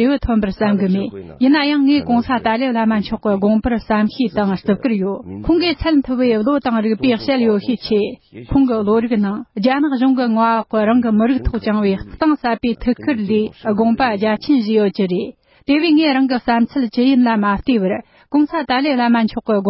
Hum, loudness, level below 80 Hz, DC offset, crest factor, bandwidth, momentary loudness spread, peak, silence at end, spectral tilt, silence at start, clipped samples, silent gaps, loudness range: none; -16 LUFS; -38 dBFS; under 0.1%; 12 dB; 5.8 kHz; 5 LU; -4 dBFS; 0 s; -11 dB/octave; 0 s; under 0.1%; none; 2 LU